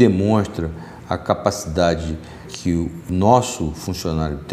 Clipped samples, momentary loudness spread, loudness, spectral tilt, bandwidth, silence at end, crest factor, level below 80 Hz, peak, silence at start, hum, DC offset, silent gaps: under 0.1%; 13 LU; -21 LUFS; -6 dB/octave; 15.5 kHz; 0 s; 20 dB; -40 dBFS; 0 dBFS; 0 s; none; under 0.1%; none